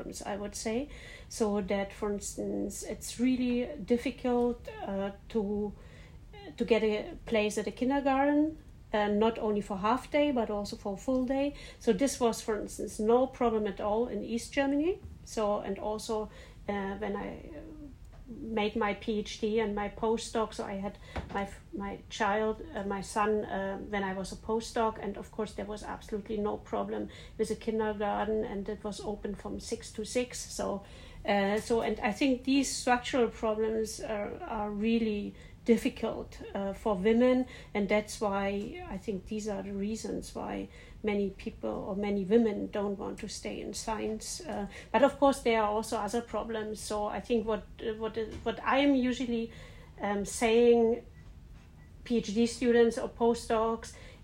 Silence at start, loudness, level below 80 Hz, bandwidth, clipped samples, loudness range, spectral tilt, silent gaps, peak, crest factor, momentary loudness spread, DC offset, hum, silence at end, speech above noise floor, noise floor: 0 s; -32 LUFS; -52 dBFS; 16 kHz; under 0.1%; 5 LU; -5 dB/octave; none; -10 dBFS; 22 dB; 12 LU; under 0.1%; none; 0 s; 20 dB; -52 dBFS